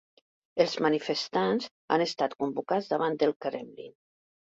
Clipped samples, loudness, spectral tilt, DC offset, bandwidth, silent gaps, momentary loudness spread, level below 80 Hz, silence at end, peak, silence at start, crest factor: under 0.1%; -29 LUFS; -5 dB/octave; under 0.1%; 7.8 kHz; 1.71-1.88 s, 3.36-3.40 s; 12 LU; -74 dBFS; 0.6 s; -10 dBFS; 0.55 s; 20 dB